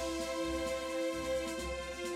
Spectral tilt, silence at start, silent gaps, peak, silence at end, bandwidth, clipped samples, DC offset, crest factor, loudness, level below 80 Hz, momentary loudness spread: -3.5 dB/octave; 0 s; none; -26 dBFS; 0 s; 16 kHz; under 0.1%; under 0.1%; 12 dB; -37 LUFS; -52 dBFS; 3 LU